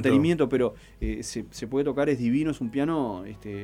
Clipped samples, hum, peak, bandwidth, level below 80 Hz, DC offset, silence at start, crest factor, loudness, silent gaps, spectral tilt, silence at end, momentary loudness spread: under 0.1%; none; -10 dBFS; 13.5 kHz; -44 dBFS; under 0.1%; 0 s; 16 dB; -27 LUFS; none; -6.5 dB/octave; 0 s; 12 LU